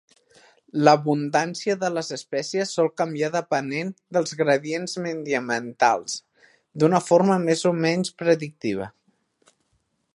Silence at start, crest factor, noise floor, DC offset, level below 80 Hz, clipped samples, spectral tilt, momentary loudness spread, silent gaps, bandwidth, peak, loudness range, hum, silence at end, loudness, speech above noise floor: 0.75 s; 22 dB; -71 dBFS; under 0.1%; -70 dBFS; under 0.1%; -5 dB/octave; 11 LU; none; 11.5 kHz; -2 dBFS; 3 LU; none; 1.25 s; -23 LUFS; 48 dB